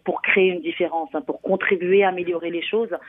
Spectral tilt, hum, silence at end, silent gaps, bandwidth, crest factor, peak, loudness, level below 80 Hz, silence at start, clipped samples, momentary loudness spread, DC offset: -8.5 dB/octave; none; 0 s; none; 3.9 kHz; 18 dB; -2 dBFS; -21 LUFS; -70 dBFS; 0.05 s; under 0.1%; 8 LU; under 0.1%